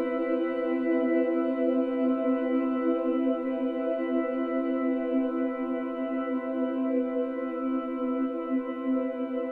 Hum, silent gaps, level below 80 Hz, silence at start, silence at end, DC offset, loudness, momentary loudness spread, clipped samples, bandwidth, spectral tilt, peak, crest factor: none; none; -70 dBFS; 0 s; 0 s; under 0.1%; -28 LUFS; 4 LU; under 0.1%; 3.9 kHz; -7.5 dB/octave; -14 dBFS; 12 dB